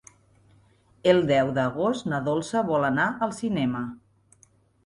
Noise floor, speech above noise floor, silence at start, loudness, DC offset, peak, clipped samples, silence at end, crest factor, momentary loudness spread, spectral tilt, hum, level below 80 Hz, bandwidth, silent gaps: -61 dBFS; 37 dB; 1.05 s; -25 LUFS; under 0.1%; -6 dBFS; under 0.1%; 0.9 s; 20 dB; 7 LU; -6 dB/octave; none; -60 dBFS; 11.5 kHz; none